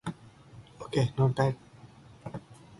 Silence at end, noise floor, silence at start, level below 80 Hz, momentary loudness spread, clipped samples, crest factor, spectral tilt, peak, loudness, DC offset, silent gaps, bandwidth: 0.05 s; -53 dBFS; 0.05 s; -60 dBFS; 21 LU; under 0.1%; 20 dB; -7.5 dB/octave; -14 dBFS; -29 LUFS; under 0.1%; none; 11.5 kHz